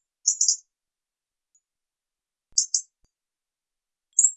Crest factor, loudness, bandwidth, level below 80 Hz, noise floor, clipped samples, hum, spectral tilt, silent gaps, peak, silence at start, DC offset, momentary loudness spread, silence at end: 26 dB; -23 LUFS; 12 kHz; -78 dBFS; -90 dBFS; under 0.1%; none; 7 dB/octave; none; -4 dBFS; 0.25 s; under 0.1%; 7 LU; 0 s